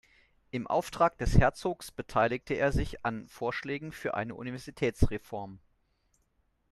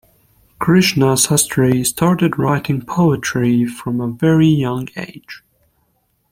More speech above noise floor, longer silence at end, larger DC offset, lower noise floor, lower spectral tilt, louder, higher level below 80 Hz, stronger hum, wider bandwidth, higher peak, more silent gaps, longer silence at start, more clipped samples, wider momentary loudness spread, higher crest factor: second, 43 dB vs 48 dB; first, 1.15 s vs 0.95 s; neither; first, -73 dBFS vs -63 dBFS; first, -6.5 dB/octave vs -5 dB/octave; second, -32 LUFS vs -15 LUFS; first, -40 dBFS vs -48 dBFS; neither; second, 13 kHz vs 16.5 kHz; second, -8 dBFS vs 0 dBFS; neither; about the same, 0.55 s vs 0.6 s; neither; about the same, 14 LU vs 12 LU; first, 24 dB vs 16 dB